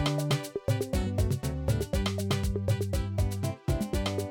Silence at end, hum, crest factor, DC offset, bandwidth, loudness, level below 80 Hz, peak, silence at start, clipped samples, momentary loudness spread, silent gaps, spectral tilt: 0 s; none; 12 dB; under 0.1%; 19 kHz; -30 LUFS; -36 dBFS; -16 dBFS; 0 s; under 0.1%; 2 LU; none; -6 dB/octave